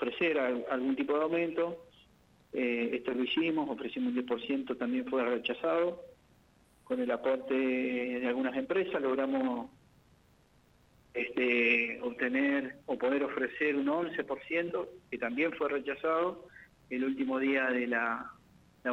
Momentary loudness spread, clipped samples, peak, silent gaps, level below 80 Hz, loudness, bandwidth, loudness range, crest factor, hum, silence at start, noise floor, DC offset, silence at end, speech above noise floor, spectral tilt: 8 LU; under 0.1%; -16 dBFS; none; -72 dBFS; -32 LUFS; 6.2 kHz; 3 LU; 18 dB; none; 0 s; -65 dBFS; under 0.1%; 0 s; 33 dB; -6.5 dB/octave